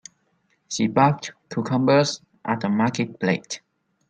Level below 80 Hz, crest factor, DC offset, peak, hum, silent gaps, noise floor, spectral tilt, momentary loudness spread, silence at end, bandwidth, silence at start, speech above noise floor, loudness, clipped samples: -64 dBFS; 20 dB; under 0.1%; -4 dBFS; none; none; -68 dBFS; -5.5 dB/octave; 13 LU; 0.5 s; 9.4 kHz; 0.7 s; 46 dB; -23 LUFS; under 0.1%